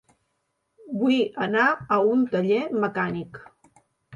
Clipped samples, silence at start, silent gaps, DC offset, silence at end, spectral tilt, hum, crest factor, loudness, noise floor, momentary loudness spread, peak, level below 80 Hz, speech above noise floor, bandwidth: under 0.1%; 0.85 s; none; under 0.1%; 0 s; -7 dB/octave; none; 16 dB; -23 LUFS; -75 dBFS; 10 LU; -8 dBFS; -66 dBFS; 52 dB; 7.2 kHz